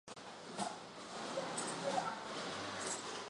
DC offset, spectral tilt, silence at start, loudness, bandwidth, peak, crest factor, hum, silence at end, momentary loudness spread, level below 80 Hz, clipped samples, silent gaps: under 0.1%; -2.5 dB/octave; 0.05 s; -42 LUFS; 11.5 kHz; -24 dBFS; 20 dB; none; 0 s; 10 LU; -78 dBFS; under 0.1%; none